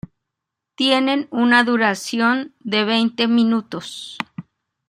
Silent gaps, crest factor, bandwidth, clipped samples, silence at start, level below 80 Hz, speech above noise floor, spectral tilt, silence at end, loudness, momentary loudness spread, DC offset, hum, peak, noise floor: none; 18 dB; 12.5 kHz; under 0.1%; 0.8 s; -64 dBFS; 64 dB; -4 dB/octave; 0.45 s; -18 LUFS; 15 LU; under 0.1%; none; -2 dBFS; -82 dBFS